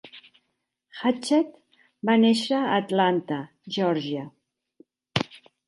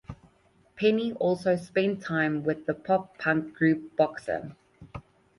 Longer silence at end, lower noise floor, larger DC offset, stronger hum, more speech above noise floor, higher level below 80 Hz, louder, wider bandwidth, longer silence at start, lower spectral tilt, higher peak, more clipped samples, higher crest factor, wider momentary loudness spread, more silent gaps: about the same, 0.3 s vs 0.4 s; first, -78 dBFS vs -63 dBFS; neither; neither; first, 55 dB vs 36 dB; second, -68 dBFS vs -60 dBFS; about the same, -25 LUFS vs -27 LUFS; about the same, 11.5 kHz vs 11.5 kHz; about the same, 0.05 s vs 0.1 s; second, -5.5 dB/octave vs -7 dB/octave; first, -4 dBFS vs -10 dBFS; neither; about the same, 22 dB vs 18 dB; second, 13 LU vs 20 LU; neither